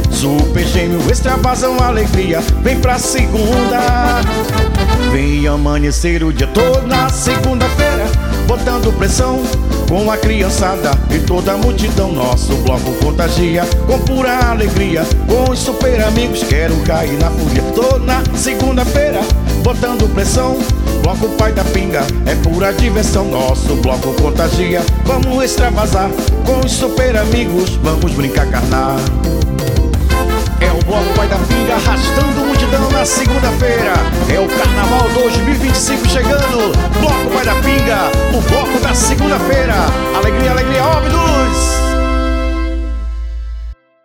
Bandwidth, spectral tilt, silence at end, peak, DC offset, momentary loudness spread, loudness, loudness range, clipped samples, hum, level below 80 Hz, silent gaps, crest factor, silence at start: 19 kHz; -5 dB/octave; 0.3 s; 0 dBFS; under 0.1%; 3 LU; -13 LUFS; 2 LU; under 0.1%; none; -16 dBFS; none; 12 dB; 0 s